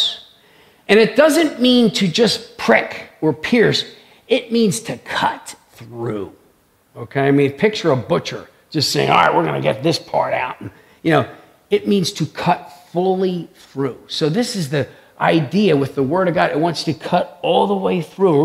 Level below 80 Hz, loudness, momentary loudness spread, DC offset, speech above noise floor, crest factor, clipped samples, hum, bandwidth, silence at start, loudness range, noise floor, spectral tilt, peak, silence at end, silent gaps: -58 dBFS; -17 LUFS; 15 LU; under 0.1%; 39 dB; 18 dB; under 0.1%; none; 15.5 kHz; 0 s; 5 LU; -56 dBFS; -5 dB/octave; 0 dBFS; 0 s; none